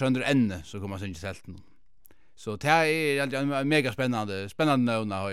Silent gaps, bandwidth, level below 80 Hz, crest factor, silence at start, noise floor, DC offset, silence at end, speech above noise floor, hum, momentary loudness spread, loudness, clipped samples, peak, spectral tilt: none; 15 kHz; -62 dBFS; 20 dB; 0 s; -63 dBFS; 0.3%; 0 s; 36 dB; none; 15 LU; -26 LUFS; under 0.1%; -6 dBFS; -5.5 dB/octave